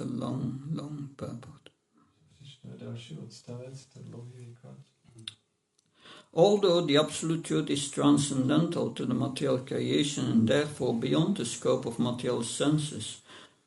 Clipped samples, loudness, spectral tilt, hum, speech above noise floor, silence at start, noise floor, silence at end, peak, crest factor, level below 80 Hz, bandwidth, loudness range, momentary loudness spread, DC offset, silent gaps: under 0.1%; -28 LUFS; -5.5 dB/octave; none; 45 dB; 0 s; -74 dBFS; 0.2 s; -10 dBFS; 20 dB; -68 dBFS; 11.5 kHz; 19 LU; 21 LU; under 0.1%; none